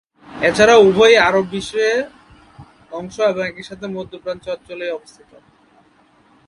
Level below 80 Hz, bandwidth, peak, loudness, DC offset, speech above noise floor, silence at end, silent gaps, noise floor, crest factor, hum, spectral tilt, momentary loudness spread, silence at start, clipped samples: -50 dBFS; 11 kHz; 0 dBFS; -15 LUFS; under 0.1%; 38 dB; 1.5 s; none; -54 dBFS; 18 dB; none; -4 dB/octave; 21 LU; 0.3 s; under 0.1%